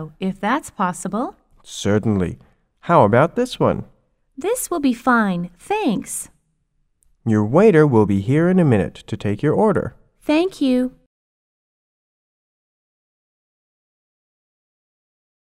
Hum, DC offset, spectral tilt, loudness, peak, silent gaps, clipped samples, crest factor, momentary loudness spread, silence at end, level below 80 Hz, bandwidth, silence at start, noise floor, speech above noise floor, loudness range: none; under 0.1%; -6.5 dB/octave; -19 LUFS; 0 dBFS; none; under 0.1%; 20 dB; 14 LU; 4.65 s; -50 dBFS; 16 kHz; 0 s; -66 dBFS; 49 dB; 7 LU